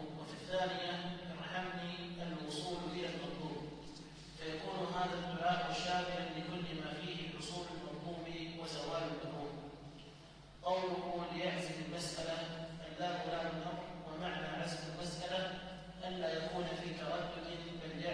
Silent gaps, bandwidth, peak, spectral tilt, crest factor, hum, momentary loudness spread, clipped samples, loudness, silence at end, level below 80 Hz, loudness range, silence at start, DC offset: none; 11 kHz; -24 dBFS; -4.5 dB/octave; 18 dB; none; 10 LU; under 0.1%; -42 LUFS; 0 s; -64 dBFS; 4 LU; 0 s; under 0.1%